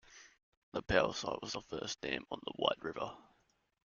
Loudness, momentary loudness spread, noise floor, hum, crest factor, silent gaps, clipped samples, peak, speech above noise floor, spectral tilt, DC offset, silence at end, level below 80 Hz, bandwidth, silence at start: -38 LUFS; 13 LU; -75 dBFS; none; 26 dB; 0.43-0.72 s; under 0.1%; -14 dBFS; 37 dB; -3.5 dB/octave; under 0.1%; 0.7 s; -60 dBFS; 7.4 kHz; 0.1 s